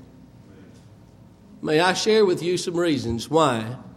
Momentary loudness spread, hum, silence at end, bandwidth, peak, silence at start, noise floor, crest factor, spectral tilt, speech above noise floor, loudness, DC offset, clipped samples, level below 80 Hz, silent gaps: 7 LU; none; 0 s; 15 kHz; -4 dBFS; 0 s; -49 dBFS; 20 dB; -4.5 dB/octave; 28 dB; -21 LUFS; under 0.1%; under 0.1%; -54 dBFS; none